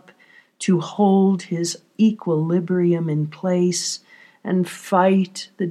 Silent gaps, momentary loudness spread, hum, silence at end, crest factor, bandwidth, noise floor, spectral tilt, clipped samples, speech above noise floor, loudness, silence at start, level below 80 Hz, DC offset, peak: none; 10 LU; none; 0 s; 16 dB; 13 kHz; -53 dBFS; -6 dB/octave; under 0.1%; 33 dB; -20 LUFS; 0.6 s; -82 dBFS; under 0.1%; -4 dBFS